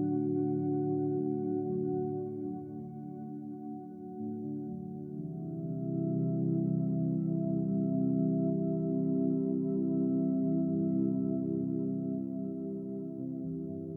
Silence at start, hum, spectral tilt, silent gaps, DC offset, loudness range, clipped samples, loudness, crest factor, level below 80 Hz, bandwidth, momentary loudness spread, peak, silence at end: 0 s; none; -14.5 dB/octave; none; under 0.1%; 8 LU; under 0.1%; -33 LUFS; 14 dB; -72 dBFS; 1.6 kHz; 11 LU; -20 dBFS; 0 s